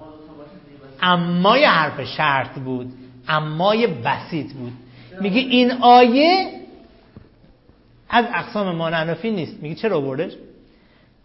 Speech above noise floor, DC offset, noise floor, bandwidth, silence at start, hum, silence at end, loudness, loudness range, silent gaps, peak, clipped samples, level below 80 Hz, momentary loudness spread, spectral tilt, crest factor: 35 dB; under 0.1%; -53 dBFS; 5.8 kHz; 0 s; none; 0.9 s; -18 LUFS; 6 LU; none; -2 dBFS; under 0.1%; -56 dBFS; 16 LU; -9 dB/octave; 18 dB